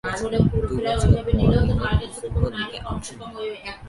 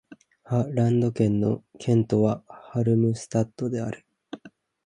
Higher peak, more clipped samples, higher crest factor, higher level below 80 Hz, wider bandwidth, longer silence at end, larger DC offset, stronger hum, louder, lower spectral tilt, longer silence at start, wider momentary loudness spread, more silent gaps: first, -2 dBFS vs -8 dBFS; neither; about the same, 20 dB vs 16 dB; first, -28 dBFS vs -56 dBFS; first, 11.5 kHz vs 10 kHz; second, 0 s vs 0.35 s; neither; neither; about the same, -23 LUFS vs -25 LUFS; second, -6.5 dB/octave vs -8.5 dB/octave; about the same, 0.05 s vs 0.1 s; second, 13 LU vs 18 LU; neither